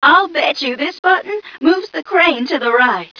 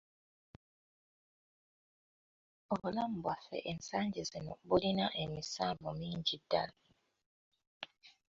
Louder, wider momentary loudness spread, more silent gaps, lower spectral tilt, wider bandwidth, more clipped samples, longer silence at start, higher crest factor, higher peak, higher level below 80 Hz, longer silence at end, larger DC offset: first, -14 LUFS vs -38 LUFS; second, 6 LU vs 12 LU; second, 0.99-1.03 s vs 7.26-7.52 s, 7.67-7.80 s; about the same, -3.5 dB/octave vs -4 dB/octave; second, 5.4 kHz vs 7.6 kHz; neither; second, 0 s vs 2.7 s; second, 14 dB vs 24 dB; first, 0 dBFS vs -16 dBFS; first, -60 dBFS vs -66 dBFS; about the same, 0.15 s vs 0.2 s; neither